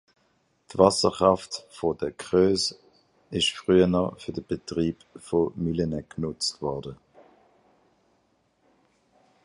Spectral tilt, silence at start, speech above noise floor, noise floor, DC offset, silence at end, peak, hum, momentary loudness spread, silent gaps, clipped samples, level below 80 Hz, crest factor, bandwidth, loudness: -5 dB/octave; 0.7 s; 44 dB; -68 dBFS; under 0.1%; 2.5 s; -4 dBFS; none; 14 LU; none; under 0.1%; -52 dBFS; 24 dB; 11.5 kHz; -25 LUFS